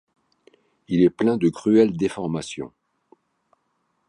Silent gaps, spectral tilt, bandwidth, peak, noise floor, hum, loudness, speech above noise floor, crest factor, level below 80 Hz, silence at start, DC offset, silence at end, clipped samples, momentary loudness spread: none; -7 dB/octave; 11 kHz; -6 dBFS; -71 dBFS; none; -21 LUFS; 51 dB; 18 dB; -58 dBFS; 0.9 s; under 0.1%; 1.4 s; under 0.1%; 15 LU